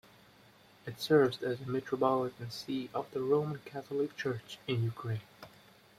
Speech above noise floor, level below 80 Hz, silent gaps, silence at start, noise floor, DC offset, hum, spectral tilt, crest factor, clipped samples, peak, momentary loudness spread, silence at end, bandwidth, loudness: 28 dB; -72 dBFS; none; 0.85 s; -61 dBFS; under 0.1%; none; -6.5 dB/octave; 20 dB; under 0.1%; -14 dBFS; 15 LU; 0.5 s; 15.5 kHz; -34 LUFS